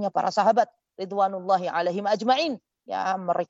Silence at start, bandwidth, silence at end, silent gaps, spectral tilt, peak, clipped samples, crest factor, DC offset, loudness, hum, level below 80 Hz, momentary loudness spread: 0 s; 8 kHz; 0.05 s; none; -5 dB/octave; -10 dBFS; under 0.1%; 16 dB; under 0.1%; -25 LUFS; none; -80 dBFS; 11 LU